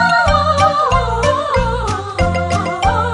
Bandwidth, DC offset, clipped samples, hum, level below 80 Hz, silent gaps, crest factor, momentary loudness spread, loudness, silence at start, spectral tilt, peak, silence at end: 11.5 kHz; under 0.1%; under 0.1%; none; -26 dBFS; none; 14 dB; 6 LU; -15 LUFS; 0 s; -5 dB/octave; -2 dBFS; 0 s